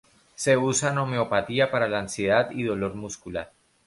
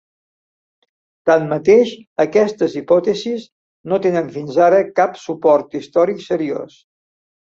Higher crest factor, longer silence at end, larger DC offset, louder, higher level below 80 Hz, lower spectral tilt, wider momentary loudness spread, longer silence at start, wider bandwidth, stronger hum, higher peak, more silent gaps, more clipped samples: about the same, 18 dB vs 16 dB; second, 0.4 s vs 0.9 s; neither; second, -25 LUFS vs -16 LUFS; first, -56 dBFS vs -62 dBFS; second, -4.5 dB/octave vs -6 dB/octave; about the same, 12 LU vs 10 LU; second, 0.4 s vs 1.25 s; first, 11.5 kHz vs 7.6 kHz; neither; second, -6 dBFS vs -2 dBFS; second, none vs 2.07-2.16 s, 3.52-3.84 s; neither